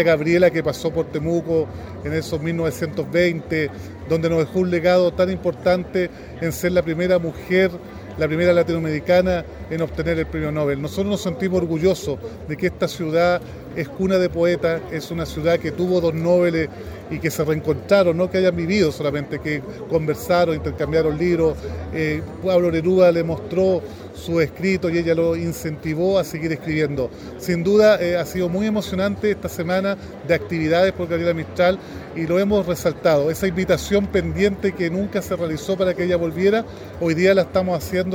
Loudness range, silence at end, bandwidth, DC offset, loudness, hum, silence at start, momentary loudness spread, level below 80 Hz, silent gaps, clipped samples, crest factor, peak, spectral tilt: 2 LU; 0 s; 18 kHz; under 0.1%; -20 LUFS; none; 0 s; 9 LU; -44 dBFS; none; under 0.1%; 16 dB; -2 dBFS; -6.5 dB/octave